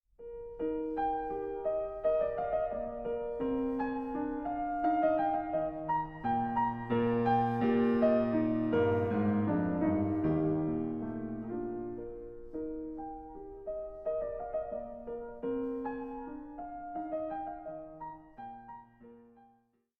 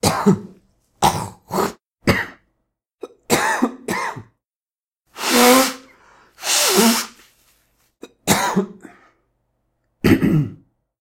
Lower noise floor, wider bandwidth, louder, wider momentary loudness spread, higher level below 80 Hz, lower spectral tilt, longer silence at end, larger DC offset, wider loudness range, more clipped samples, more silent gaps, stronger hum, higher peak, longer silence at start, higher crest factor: second, -71 dBFS vs under -90 dBFS; second, 5.4 kHz vs 16.5 kHz; second, -33 LUFS vs -18 LUFS; about the same, 16 LU vs 18 LU; second, -56 dBFS vs -48 dBFS; first, -10 dB/octave vs -3.5 dB/octave; first, 0.75 s vs 0.45 s; neither; first, 11 LU vs 6 LU; neither; second, none vs 4.45-4.49 s, 4.56-4.65 s, 4.75-4.79 s, 4.86-4.92 s; neither; second, -16 dBFS vs 0 dBFS; first, 0.2 s vs 0.05 s; about the same, 16 dB vs 20 dB